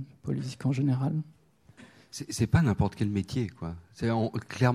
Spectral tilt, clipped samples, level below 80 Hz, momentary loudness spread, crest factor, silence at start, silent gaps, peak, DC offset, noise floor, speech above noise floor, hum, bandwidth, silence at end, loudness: -7 dB/octave; under 0.1%; -50 dBFS; 15 LU; 20 dB; 0 s; none; -10 dBFS; under 0.1%; -55 dBFS; 27 dB; none; 13 kHz; 0 s; -30 LUFS